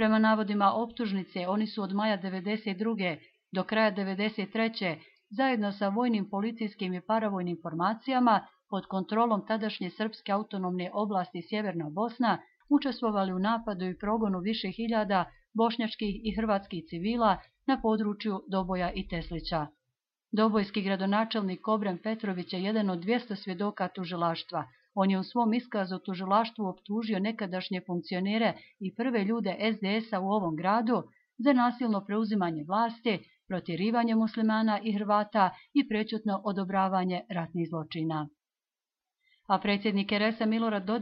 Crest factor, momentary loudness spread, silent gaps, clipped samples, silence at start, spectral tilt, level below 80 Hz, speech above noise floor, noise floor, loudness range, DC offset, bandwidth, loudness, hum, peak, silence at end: 18 dB; 8 LU; none; under 0.1%; 0 s; -9.5 dB/octave; -58 dBFS; over 60 dB; under -90 dBFS; 3 LU; under 0.1%; 5.6 kHz; -30 LUFS; none; -12 dBFS; 0 s